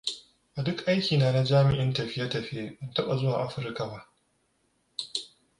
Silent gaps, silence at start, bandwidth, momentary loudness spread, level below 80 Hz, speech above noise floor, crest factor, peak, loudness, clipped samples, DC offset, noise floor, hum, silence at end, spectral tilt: none; 0.05 s; 11 kHz; 15 LU; -58 dBFS; 45 dB; 18 dB; -10 dBFS; -28 LUFS; under 0.1%; under 0.1%; -72 dBFS; none; 0.3 s; -6 dB/octave